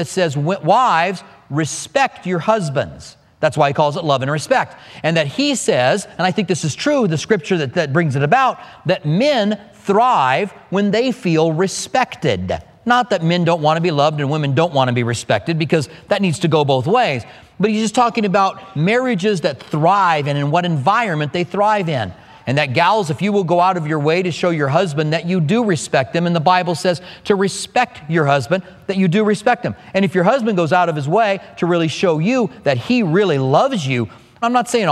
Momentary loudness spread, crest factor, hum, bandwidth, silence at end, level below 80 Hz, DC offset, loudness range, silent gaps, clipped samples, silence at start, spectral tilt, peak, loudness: 6 LU; 16 dB; none; 13 kHz; 0 s; -56 dBFS; under 0.1%; 1 LU; none; under 0.1%; 0 s; -5.5 dB/octave; 0 dBFS; -17 LUFS